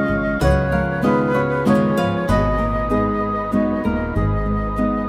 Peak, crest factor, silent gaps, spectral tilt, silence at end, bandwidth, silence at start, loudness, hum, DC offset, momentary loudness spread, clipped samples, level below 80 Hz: -4 dBFS; 14 dB; none; -8 dB/octave; 0 s; 15.5 kHz; 0 s; -19 LUFS; none; under 0.1%; 4 LU; under 0.1%; -28 dBFS